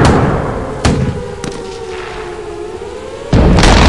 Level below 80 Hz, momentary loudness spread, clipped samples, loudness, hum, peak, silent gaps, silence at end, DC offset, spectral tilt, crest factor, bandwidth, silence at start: -18 dBFS; 15 LU; 0.3%; -15 LUFS; none; 0 dBFS; none; 0 s; 0.9%; -5.5 dB/octave; 12 dB; 11.5 kHz; 0 s